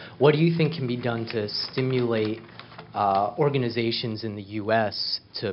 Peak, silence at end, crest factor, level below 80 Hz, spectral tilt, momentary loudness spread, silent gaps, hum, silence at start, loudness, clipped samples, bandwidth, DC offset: -6 dBFS; 0 s; 20 dB; -66 dBFS; -8.5 dB/octave; 11 LU; none; none; 0 s; -25 LUFS; under 0.1%; 5.8 kHz; under 0.1%